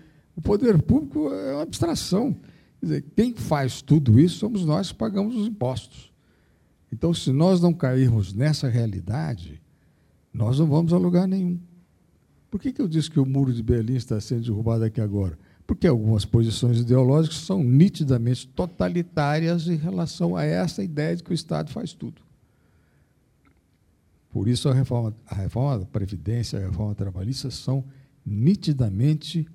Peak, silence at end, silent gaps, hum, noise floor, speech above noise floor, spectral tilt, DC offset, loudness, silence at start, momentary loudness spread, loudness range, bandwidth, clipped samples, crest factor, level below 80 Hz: -4 dBFS; 0 s; none; none; -63 dBFS; 41 dB; -7.5 dB/octave; under 0.1%; -23 LUFS; 0.35 s; 11 LU; 7 LU; 13.5 kHz; under 0.1%; 18 dB; -46 dBFS